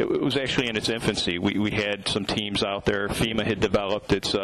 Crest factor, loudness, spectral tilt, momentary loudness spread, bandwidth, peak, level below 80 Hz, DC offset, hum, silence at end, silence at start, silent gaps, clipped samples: 12 dB; -25 LUFS; -4.5 dB/octave; 2 LU; 13 kHz; -12 dBFS; -46 dBFS; under 0.1%; none; 0 s; 0 s; none; under 0.1%